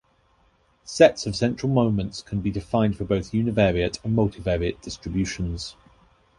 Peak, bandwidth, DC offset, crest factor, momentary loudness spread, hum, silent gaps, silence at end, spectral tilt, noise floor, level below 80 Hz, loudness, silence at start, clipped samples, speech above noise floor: -2 dBFS; 11.5 kHz; under 0.1%; 22 dB; 12 LU; none; none; 0.65 s; -6 dB/octave; -62 dBFS; -42 dBFS; -24 LUFS; 0.85 s; under 0.1%; 40 dB